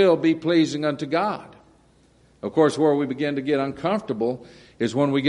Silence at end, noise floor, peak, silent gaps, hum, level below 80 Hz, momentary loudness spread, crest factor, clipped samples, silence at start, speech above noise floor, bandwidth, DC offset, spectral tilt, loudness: 0 s; -57 dBFS; -6 dBFS; none; none; -62 dBFS; 9 LU; 16 dB; under 0.1%; 0 s; 35 dB; 11 kHz; under 0.1%; -6.5 dB/octave; -23 LUFS